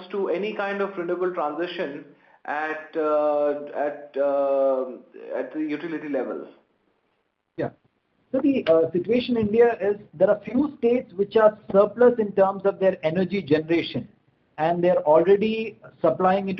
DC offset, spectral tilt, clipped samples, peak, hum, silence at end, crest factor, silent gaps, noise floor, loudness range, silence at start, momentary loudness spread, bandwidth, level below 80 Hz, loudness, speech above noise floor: under 0.1%; -8.5 dB/octave; under 0.1%; -6 dBFS; none; 0 s; 18 dB; none; -73 dBFS; 7 LU; 0 s; 13 LU; 6 kHz; -64 dBFS; -23 LUFS; 50 dB